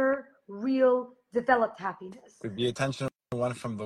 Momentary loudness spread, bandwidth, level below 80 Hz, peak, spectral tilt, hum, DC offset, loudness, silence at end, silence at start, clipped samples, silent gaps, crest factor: 16 LU; 12 kHz; -66 dBFS; -8 dBFS; -6 dB/octave; none; under 0.1%; -29 LUFS; 0 s; 0 s; under 0.1%; none; 20 dB